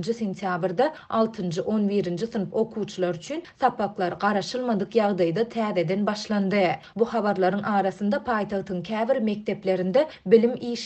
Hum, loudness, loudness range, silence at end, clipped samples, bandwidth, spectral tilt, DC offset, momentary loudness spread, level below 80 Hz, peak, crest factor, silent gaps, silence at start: none; -25 LUFS; 2 LU; 0 s; under 0.1%; 8.6 kHz; -6.5 dB/octave; under 0.1%; 6 LU; -62 dBFS; -4 dBFS; 20 dB; none; 0 s